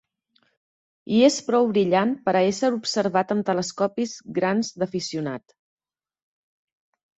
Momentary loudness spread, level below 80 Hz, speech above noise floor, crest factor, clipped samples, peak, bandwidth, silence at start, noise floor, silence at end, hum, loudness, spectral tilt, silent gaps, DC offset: 10 LU; -68 dBFS; 45 dB; 18 dB; under 0.1%; -6 dBFS; 8.2 kHz; 1.1 s; -68 dBFS; 1.8 s; none; -23 LUFS; -5 dB/octave; none; under 0.1%